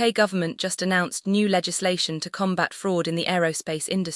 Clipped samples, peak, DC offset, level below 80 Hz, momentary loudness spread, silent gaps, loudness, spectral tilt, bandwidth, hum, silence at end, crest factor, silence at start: under 0.1%; -6 dBFS; under 0.1%; -68 dBFS; 5 LU; none; -24 LUFS; -4 dB/octave; 12 kHz; none; 0 s; 18 dB; 0 s